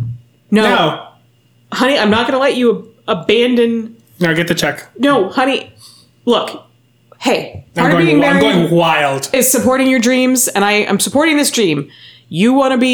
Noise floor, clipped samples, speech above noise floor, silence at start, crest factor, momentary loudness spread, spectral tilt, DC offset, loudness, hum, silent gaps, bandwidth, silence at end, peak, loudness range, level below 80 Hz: -52 dBFS; under 0.1%; 39 dB; 0 s; 12 dB; 11 LU; -4 dB/octave; under 0.1%; -13 LUFS; none; none; over 20 kHz; 0 s; -2 dBFS; 5 LU; -52 dBFS